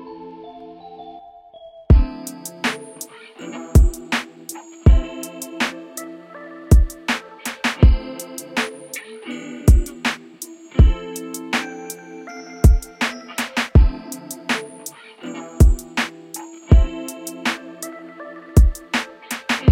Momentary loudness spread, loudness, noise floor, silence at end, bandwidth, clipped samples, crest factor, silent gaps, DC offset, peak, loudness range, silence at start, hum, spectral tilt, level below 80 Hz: 20 LU; -20 LUFS; -43 dBFS; 0 s; 16.5 kHz; under 0.1%; 20 dB; none; under 0.1%; 0 dBFS; 1 LU; 0 s; none; -5.5 dB/octave; -22 dBFS